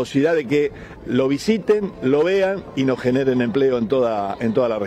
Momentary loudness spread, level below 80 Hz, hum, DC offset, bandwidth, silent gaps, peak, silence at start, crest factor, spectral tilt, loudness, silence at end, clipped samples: 4 LU; -50 dBFS; none; under 0.1%; 12.5 kHz; none; -6 dBFS; 0 s; 14 dB; -6.5 dB/octave; -20 LUFS; 0 s; under 0.1%